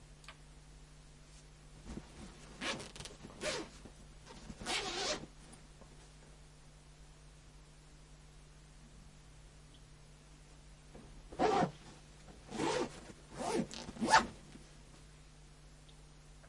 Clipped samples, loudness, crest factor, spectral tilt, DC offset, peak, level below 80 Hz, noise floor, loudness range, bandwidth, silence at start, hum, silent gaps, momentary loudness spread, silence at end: under 0.1%; -38 LUFS; 30 dB; -3.5 dB/octave; under 0.1%; -12 dBFS; -60 dBFS; -58 dBFS; 22 LU; 11.5 kHz; 0 s; none; none; 23 LU; 0 s